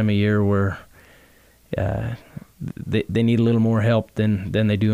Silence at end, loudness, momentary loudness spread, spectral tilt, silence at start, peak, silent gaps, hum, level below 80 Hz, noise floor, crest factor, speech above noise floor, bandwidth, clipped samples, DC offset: 0 s; -21 LUFS; 16 LU; -8.5 dB/octave; 0 s; -8 dBFS; none; none; -46 dBFS; -53 dBFS; 12 dB; 34 dB; 9.2 kHz; under 0.1%; under 0.1%